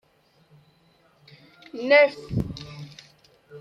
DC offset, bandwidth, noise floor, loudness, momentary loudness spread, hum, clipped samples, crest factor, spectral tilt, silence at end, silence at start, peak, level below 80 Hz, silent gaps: under 0.1%; 7.4 kHz; -62 dBFS; -21 LUFS; 24 LU; none; under 0.1%; 22 dB; -6 dB/octave; 0 s; 1.75 s; -6 dBFS; -52 dBFS; none